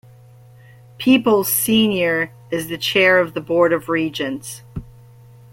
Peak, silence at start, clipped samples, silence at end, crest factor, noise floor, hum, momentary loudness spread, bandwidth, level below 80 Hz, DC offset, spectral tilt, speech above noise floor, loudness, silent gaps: -2 dBFS; 1 s; under 0.1%; 0.65 s; 18 dB; -45 dBFS; none; 16 LU; 16.5 kHz; -50 dBFS; under 0.1%; -3.5 dB/octave; 28 dB; -17 LUFS; none